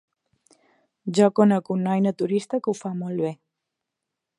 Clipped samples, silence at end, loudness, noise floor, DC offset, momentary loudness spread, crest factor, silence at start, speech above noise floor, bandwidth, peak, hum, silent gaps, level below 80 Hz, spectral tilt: under 0.1%; 1.05 s; -23 LUFS; -84 dBFS; under 0.1%; 11 LU; 20 dB; 1.05 s; 62 dB; 11 kHz; -4 dBFS; none; none; -74 dBFS; -7 dB/octave